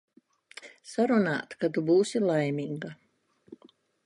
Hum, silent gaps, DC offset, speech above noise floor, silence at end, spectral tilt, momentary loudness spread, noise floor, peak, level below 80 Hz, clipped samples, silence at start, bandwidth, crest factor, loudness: none; none; under 0.1%; 34 dB; 0.5 s; -6 dB/octave; 22 LU; -61 dBFS; -14 dBFS; -76 dBFS; under 0.1%; 0.6 s; 11.5 kHz; 16 dB; -27 LUFS